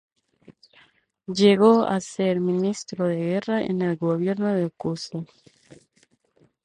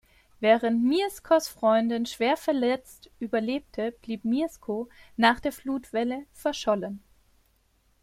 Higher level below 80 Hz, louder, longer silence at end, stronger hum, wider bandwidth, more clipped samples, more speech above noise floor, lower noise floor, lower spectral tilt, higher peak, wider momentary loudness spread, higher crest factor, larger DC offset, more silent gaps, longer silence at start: second, -66 dBFS vs -60 dBFS; first, -23 LUFS vs -27 LUFS; first, 1.4 s vs 1.05 s; neither; second, 10.5 kHz vs 16 kHz; neither; about the same, 42 dB vs 40 dB; about the same, -64 dBFS vs -67 dBFS; first, -6.5 dB/octave vs -4.5 dB/octave; about the same, -4 dBFS vs -6 dBFS; first, 15 LU vs 11 LU; about the same, 20 dB vs 22 dB; neither; neither; about the same, 0.5 s vs 0.4 s